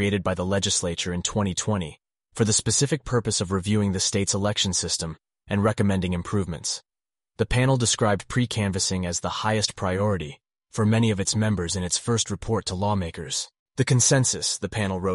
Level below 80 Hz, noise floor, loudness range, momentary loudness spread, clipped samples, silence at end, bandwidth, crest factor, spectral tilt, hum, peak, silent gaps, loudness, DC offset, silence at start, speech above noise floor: -46 dBFS; -81 dBFS; 1 LU; 8 LU; under 0.1%; 0 s; 11.5 kHz; 18 dB; -4 dB/octave; none; -6 dBFS; 13.59-13.66 s; -24 LUFS; under 0.1%; 0 s; 57 dB